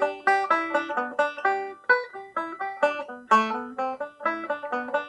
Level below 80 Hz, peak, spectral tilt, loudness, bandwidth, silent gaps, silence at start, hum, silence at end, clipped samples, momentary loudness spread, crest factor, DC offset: -76 dBFS; -6 dBFS; -3.5 dB/octave; -26 LUFS; 11 kHz; none; 0 s; none; 0 s; under 0.1%; 10 LU; 20 dB; under 0.1%